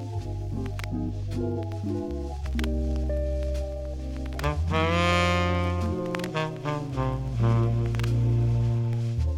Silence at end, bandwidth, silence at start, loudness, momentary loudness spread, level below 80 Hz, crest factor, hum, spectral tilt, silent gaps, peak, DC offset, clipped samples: 0 s; 12 kHz; 0 s; -28 LUFS; 10 LU; -34 dBFS; 16 dB; none; -7 dB/octave; none; -10 dBFS; under 0.1%; under 0.1%